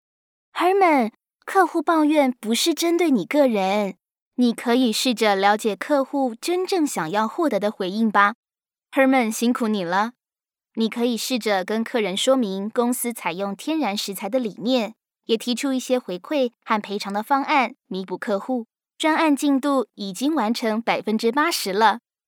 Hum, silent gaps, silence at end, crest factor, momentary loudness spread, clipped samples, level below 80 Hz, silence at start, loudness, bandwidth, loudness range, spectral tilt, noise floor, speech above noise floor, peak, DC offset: none; 4.22-4.31 s, 8.35-8.43 s; 0.3 s; 18 dB; 8 LU; under 0.1%; -88 dBFS; 0.55 s; -22 LUFS; 20 kHz; 4 LU; -4 dB/octave; under -90 dBFS; over 69 dB; -4 dBFS; under 0.1%